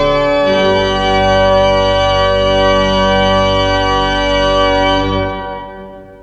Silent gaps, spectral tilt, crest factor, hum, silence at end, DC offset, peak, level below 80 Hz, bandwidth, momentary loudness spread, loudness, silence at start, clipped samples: none; -5 dB/octave; 12 dB; none; 0.05 s; under 0.1%; 0 dBFS; -26 dBFS; 8.2 kHz; 7 LU; -12 LUFS; 0 s; under 0.1%